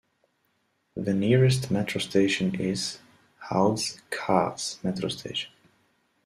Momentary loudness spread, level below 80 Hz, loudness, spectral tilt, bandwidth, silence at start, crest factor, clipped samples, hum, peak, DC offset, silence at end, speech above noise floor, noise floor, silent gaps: 11 LU; -60 dBFS; -26 LUFS; -5 dB/octave; 14 kHz; 0.95 s; 20 dB; under 0.1%; none; -6 dBFS; under 0.1%; 0.75 s; 47 dB; -72 dBFS; none